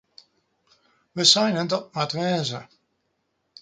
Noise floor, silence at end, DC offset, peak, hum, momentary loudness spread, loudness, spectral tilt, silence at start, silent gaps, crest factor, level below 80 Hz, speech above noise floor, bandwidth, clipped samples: -74 dBFS; 1 s; under 0.1%; -2 dBFS; none; 16 LU; -21 LUFS; -3 dB/octave; 1.15 s; none; 24 dB; -70 dBFS; 51 dB; 9.6 kHz; under 0.1%